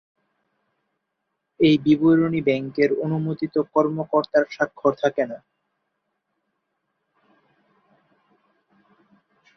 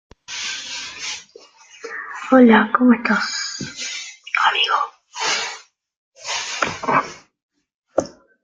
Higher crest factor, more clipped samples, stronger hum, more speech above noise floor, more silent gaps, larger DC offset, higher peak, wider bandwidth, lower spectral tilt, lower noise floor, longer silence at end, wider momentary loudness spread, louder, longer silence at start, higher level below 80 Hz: about the same, 20 dB vs 20 dB; neither; neither; first, 58 dB vs 32 dB; second, none vs 5.97-6.12 s, 7.43-7.49 s, 7.74-7.82 s; neither; second, -6 dBFS vs -2 dBFS; second, 6.6 kHz vs 9.2 kHz; first, -7.5 dB/octave vs -3 dB/octave; first, -78 dBFS vs -47 dBFS; first, 4.2 s vs 0.35 s; second, 8 LU vs 18 LU; about the same, -21 LUFS vs -19 LUFS; first, 1.6 s vs 0.3 s; about the same, -64 dBFS vs -62 dBFS